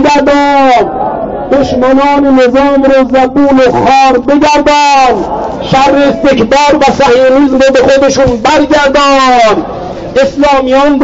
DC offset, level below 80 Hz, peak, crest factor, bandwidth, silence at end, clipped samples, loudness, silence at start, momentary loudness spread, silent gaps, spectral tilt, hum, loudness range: under 0.1%; -30 dBFS; 0 dBFS; 6 dB; 7.8 kHz; 0 s; under 0.1%; -6 LUFS; 0 s; 6 LU; none; -4.5 dB/octave; none; 1 LU